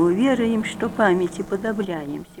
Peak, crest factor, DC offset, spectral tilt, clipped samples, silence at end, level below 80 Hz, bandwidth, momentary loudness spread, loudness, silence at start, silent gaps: -4 dBFS; 16 dB; under 0.1%; -6 dB/octave; under 0.1%; 0 s; -52 dBFS; 16 kHz; 8 LU; -22 LUFS; 0 s; none